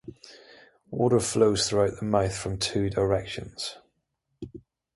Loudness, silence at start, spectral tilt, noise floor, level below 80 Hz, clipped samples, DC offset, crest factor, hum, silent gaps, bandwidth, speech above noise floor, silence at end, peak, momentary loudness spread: -26 LUFS; 0.05 s; -4.5 dB/octave; -77 dBFS; -50 dBFS; under 0.1%; under 0.1%; 20 dB; none; none; 11.5 kHz; 52 dB; 0.35 s; -8 dBFS; 21 LU